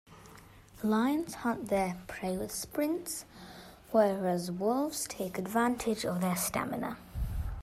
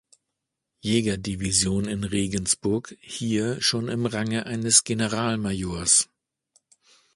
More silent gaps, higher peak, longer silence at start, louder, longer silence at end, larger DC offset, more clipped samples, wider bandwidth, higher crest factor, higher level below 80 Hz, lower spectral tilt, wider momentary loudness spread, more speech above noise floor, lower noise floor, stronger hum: neither; second, -14 dBFS vs -2 dBFS; second, 0.1 s vs 0.85 s; second, -33 LUFS vs -23 LUFS; second, 0 s vs 1.1 s; neither; neither; first, 16 kHz vs 11.5 kHz; second, 18 dB vs 24 dB; about the same, -48 dBFS vs -48 dBFS; first, -5 dB/octave vs -3 dB/octave; about the same, 11 LU vs 10 LU; second, 22 dB vs 58 dB; second, -54 dBFS vs -83 dBFS; neither